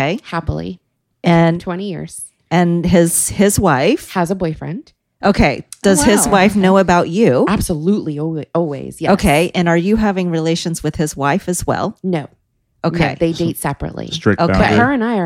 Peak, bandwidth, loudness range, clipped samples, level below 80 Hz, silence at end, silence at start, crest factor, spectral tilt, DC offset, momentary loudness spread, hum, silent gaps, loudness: 0 dBFS; 16.5 kHz; 5 LU; under 0.1%; -34 dBFS; 0 s; 0 s; 14 dB; -5 dB/octave; under 0.1%; 11 LU; none; none; -15 LUFS